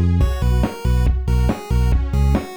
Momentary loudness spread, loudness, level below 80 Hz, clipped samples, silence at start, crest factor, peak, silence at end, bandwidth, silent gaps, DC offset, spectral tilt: 2 LU; -19 LUFS; -18 dBFS; under 0.1%; 0 s; 10 dB; -6 dBFS; 0 s; 13 kHz; none; under 0.1%; -7.5 dB/octave